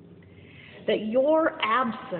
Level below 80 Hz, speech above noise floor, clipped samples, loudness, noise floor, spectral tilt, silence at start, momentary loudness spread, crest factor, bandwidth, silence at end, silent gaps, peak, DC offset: -68 dBFS; 25 dB; under 0.1%; -25 LUFS; -49 dBFS; -9 dB/octave; 0.1 s; 6 LU; 18 dB; 4.4 kHz; 0 s; none; -10 dBFS; under 0.1%